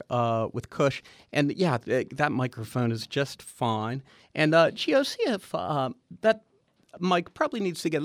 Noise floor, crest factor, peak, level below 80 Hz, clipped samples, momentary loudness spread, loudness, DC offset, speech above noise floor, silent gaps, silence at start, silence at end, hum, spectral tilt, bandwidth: -54 dBFS; 18 dB; -8 dBFS; -66 dBFS; under 0.1%; 10 LU; -27 LUFS; under 0.1%; 27 dB; none; 0.1 s; 0 s; none; -5.5 dB/octave; 15.5 kHz